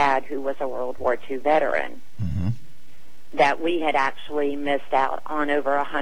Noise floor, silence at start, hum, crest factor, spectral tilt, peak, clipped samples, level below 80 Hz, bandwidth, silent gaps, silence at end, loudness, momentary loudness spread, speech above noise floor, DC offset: -55 dBFS; 0 s; none; 16 dB; -6.5 dB/octave; -8 dBFS; under 0.1%; -50 dBFS; 16.5 kHz; none; 0 s; -24 LUFS; 9 LU; 31 dB; 5%